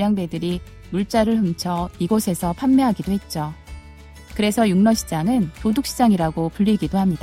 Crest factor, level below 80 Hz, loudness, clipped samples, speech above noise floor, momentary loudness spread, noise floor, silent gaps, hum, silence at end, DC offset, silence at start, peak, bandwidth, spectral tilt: 16 dB; -42 dBFS; -20 LUFS; under 0.1%; 22 dB; 11 LU; -42 dBFS; none; none; 0 s; under 0.1%; 0 s; -4 dBFS; 16 kHz; -6 dB/octave